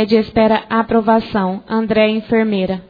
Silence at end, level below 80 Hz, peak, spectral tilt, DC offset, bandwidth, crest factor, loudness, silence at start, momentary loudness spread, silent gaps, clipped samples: 0.1 s; -44 dBFS; -2 dBFS; -8.5 dB/octave; under 0.1%; 5 kHz; 14 dB; -15 LUFS; 0 s; 5 LU; none; under 0.1%